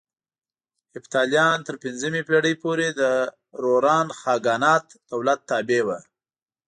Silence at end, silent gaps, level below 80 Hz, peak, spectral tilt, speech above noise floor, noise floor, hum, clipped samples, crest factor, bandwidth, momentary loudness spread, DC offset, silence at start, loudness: 0.65 s; none; -72 dBFS; -6 dBFS; -4 dB/octave; over 68 dB; under -90 dBFS; none; under 0.1%; 18 dB; 9.8 kHz; 10 LU; under 0.1%; 0.95 s; -22 LUFS